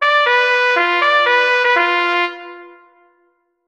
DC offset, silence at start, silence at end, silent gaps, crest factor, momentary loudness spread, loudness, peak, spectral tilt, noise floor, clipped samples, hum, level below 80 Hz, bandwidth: under 0.1%; 0 s; 1 s; none; 16 dB; 6 LU; -13 LUFS; 0 dBFS; -0.5 dB/octave; -62 dBFS; under 0.1%; none; -66 dBFS; 9 kHz